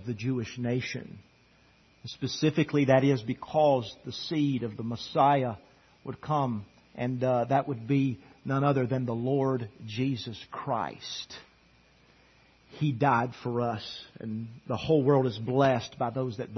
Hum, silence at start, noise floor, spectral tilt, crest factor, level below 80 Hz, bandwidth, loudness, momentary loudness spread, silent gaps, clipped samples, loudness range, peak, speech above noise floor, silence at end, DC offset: none; 0 s; -62 dBFS; -7 dB/octave; 22 dB; -64 dBFS; 6.4 kHz; -29 LUFS; 15 LU; none; under 0.1%; 5 LU; -8 dBFS; 33 dB; 0 s; under 0.1%